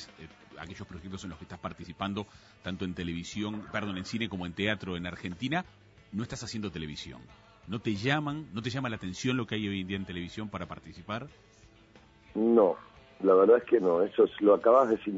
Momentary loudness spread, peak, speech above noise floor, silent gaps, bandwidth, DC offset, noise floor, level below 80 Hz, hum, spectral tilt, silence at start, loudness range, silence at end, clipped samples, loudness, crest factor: 20 LU; -10 dBFS; 28 dB; none; 8 kHz; under 0.1%; -58 dBFS; -60 dBFS; none; -6 dB/octave; 0 s; 11 LU; 0 s; under 0.1%; -30 LUFS; 20 dB